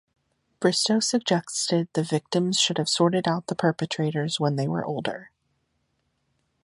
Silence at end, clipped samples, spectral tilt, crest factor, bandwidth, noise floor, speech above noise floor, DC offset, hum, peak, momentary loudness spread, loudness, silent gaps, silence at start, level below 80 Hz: 1.35 s; under 0.1%; -4.5 dB/octave; 20 dB; 11.5 kHz; -73 dBFS; 49 dB; under 0.1%; none; -6 dBFS; 6 LU; -24 LUFS; none; 0.6 s; -70 dBFS